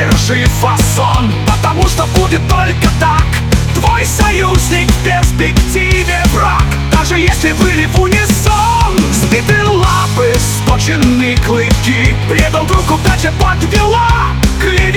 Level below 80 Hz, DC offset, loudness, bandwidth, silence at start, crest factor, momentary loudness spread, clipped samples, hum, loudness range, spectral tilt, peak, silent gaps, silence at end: -16 dBFS; under 0.1%; -10 LUFS; 18.5 kHz; 0 s; 10 dB; 2 LU; 0.1%; none; 1 LU; -5 dB/octave; 0 dBFS; none; 0 s